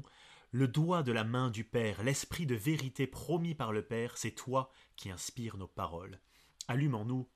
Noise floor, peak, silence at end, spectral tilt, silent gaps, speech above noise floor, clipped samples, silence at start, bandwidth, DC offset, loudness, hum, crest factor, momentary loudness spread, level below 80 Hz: -60 dBFS; -18 dBFS; 0.1 s; -5.5 dB/octave; none; 25 dB; under 0.1%; 0 s; 14.5 kHz; under 0.1%; -36 LUFS; none; 18 dB; 12 LU; -62 dBFS